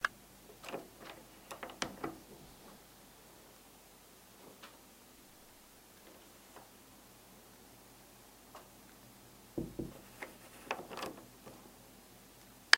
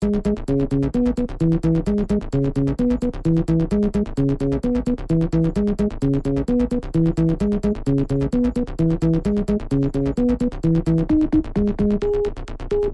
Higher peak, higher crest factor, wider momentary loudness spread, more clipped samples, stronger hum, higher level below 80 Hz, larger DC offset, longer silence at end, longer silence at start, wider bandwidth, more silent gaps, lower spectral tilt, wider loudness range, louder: first, 0 dBFS vs -8 dBFS; first, 44 dB vs 12 dB; first, 15 LU vs 3 LU; neither; neither; second, -68 dBFS vs -30 dBFS; neither; about the same, 0 s vs 0 s; about the same, 0 s vs 0 s; first, 16 kHz vs 11 kHz; neither; second, -2 dB/octave vs -9.5 dB/octave; first, 10 LU vs 1 LU; second, -50 LUFS vs -21 LUFS